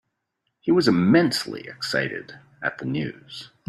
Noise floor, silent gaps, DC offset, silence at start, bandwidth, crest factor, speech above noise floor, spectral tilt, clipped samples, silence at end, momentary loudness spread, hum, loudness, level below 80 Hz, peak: -77 dBFS; none; under 0.1%; 0.65 s; 14 kHz; 20 dB; 55 dB; -5.5 dB/octave; under 0.1%; 0.25 s; 16 LU; none; -23 LUFS; -62 dBFS; -4 dBFS